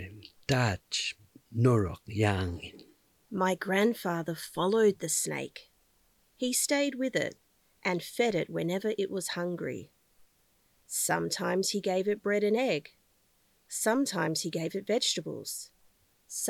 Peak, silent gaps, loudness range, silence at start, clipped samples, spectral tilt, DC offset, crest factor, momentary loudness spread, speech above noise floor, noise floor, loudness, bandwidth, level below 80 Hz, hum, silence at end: -12 dBFS; none; 3 LU; 0 s; under 0.1%; -4 dB/octave; under 0.1%; 18 dB; 12 LU; 40 dB; -69 dBFS; -30 LUFS; 18.5 kHz; -66 dBFS; none; 0 s